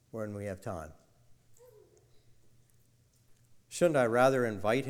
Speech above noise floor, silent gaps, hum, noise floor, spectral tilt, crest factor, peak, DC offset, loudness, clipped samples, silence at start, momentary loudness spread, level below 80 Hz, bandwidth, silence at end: 37 dB; none; none; -67 dBFS; -5.5 dB/octave; 22 dB; -12 dBFS; under 0.1%; -30 LUFS; under 0.1%; 0.15 s; 18 LU; -64 dBFS; 16.5 kHz; 0 s